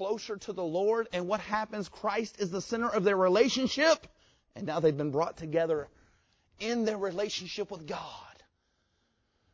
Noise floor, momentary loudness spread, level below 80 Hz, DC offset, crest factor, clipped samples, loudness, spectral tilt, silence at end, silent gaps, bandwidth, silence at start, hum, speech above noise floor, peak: -76 dBFS; 13 LU; -66 dBFS; under 0.1%; 20 dB; under 0.1%; -31 LUFS; -4.5 dB/octave; 1.2 s; none; 8 kHz; 0 s; none; 45 dB; -12 dBFS